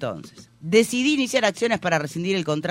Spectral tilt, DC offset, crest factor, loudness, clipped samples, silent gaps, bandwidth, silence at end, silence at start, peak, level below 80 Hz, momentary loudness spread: -4.5 dB/octave; under 0.1%; 18 dB; -22 LUFS; under 0.1%; none; 16 kHz; 0 s; 0 s; -6 dBFS; -62 dBFS; 11 LU